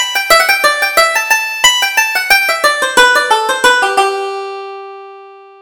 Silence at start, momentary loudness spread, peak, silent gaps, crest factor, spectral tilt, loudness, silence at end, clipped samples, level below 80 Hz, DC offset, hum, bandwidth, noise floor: 0 s; 14 LU; 0 dBFS; none; 12 dB; 1 dB/octave; -10 LUFS; 0.2 s; 0.2%; -48 dBFS; under 0.1%; none; over 20 kHz; -35 dBFS